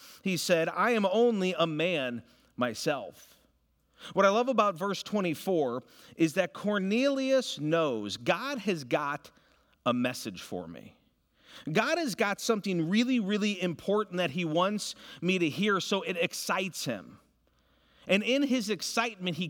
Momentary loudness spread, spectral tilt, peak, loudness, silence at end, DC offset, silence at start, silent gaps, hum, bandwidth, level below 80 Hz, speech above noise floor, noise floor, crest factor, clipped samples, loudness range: 11 LU; -4.5 dB/octave; -10 dBFS; -29 LUFS; 0 s; under 0.1%; 0 s; none; none; 19 kHz; -76 dBFS; 41 dB; -71 dBFS; 20 dB; under 0.1%; 4 LU